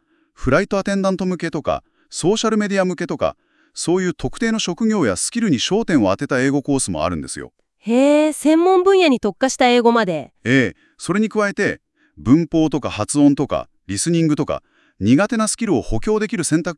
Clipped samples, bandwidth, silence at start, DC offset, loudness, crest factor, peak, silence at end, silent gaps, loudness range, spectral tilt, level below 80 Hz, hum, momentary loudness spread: under 0.1%; 12 kHz; 0.4 s; under 0.1%; -18 LUFS; 16 dB; 0 dBFS; 0.05 s; none; 4 LU; -5 dB/octave; -42 dBFS; none; 10 LU